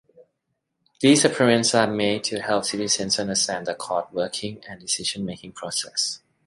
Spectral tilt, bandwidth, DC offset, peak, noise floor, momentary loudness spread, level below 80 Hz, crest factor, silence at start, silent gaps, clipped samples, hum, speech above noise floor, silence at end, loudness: -3 dB/octave; 11.5 kHz; under 0.1%; -4 dBFS; -77 dBFS; 13 LU; -62 dBFS; 20 dB; 0.2 s; none; under 0.1%; none; 54 dB; 0.3 s; -22 LUFS